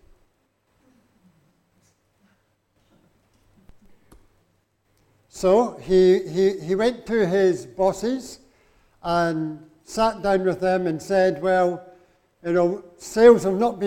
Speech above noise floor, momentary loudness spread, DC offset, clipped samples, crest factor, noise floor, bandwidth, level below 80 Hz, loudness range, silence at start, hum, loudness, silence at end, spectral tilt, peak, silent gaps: 48 dB; 15 LU; under 0.1%; under 0.1%; 20 dB; -68 dBFS; 14.5 kHz; -52 dBFS; 4 LU; 5.35 s; none; -21 LUFS; 0 s; -6 dB/octave; -2 dBFS; none